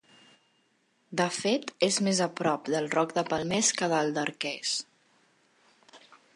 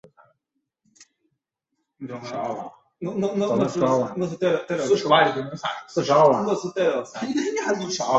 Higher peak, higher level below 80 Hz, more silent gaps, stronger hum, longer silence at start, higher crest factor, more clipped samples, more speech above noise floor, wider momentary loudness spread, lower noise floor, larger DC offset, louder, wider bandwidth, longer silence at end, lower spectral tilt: second, -8 dBFS vs -4 dBFS; second, -72 dBFS vs -66 dBFS; neither; neither; about the same, 1.1 s vs 1 s; about the same, 22 dB vs 20 dB; neither; second, 42 dB vs 56 dB; second, 7 LU vs 15 LU; second, -70 dBFS vs -79 dBFS; neither; second, -28 LUFS vs -23 LUFS; first, 11.5 kHz vs 8.2 kHz; first, 0.4 s vs 0 s; second, -3 dB/octave vs -5 dB/octave